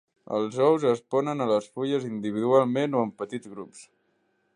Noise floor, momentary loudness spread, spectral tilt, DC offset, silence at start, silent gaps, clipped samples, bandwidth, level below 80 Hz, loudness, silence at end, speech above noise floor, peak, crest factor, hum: -71 dBFS; 14 LU; -6.5 dB/octave; under 0.1%; 0.3 s; none; under 0.1%; 10.5 kHz; -74 dBFS; -26 LUFS; 0.7 s; 45 dB; -8 dBFS; 18 dB; none